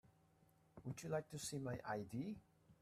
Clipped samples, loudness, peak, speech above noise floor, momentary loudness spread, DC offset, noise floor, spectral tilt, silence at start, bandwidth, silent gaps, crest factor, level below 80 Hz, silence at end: under 0.1%; -48 LUFS; -30 dBFS; 27 dB; 11 LU; under 0.1%; -74 dBFS; -5 dB/octave; 0.05 s; 15 kHz; none; 18 dB; -76 dBFS; 0.1 s